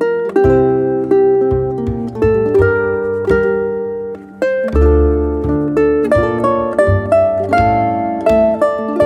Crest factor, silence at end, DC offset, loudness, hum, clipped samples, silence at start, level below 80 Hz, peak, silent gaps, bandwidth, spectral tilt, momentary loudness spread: 12 dB; 0 s; under 0.1%; -14 LUFS; none; under 0.1%; 0 s; -26 dBFS; -2 dBFS; none; 10 kHz; -9 dB/octave; 7 LU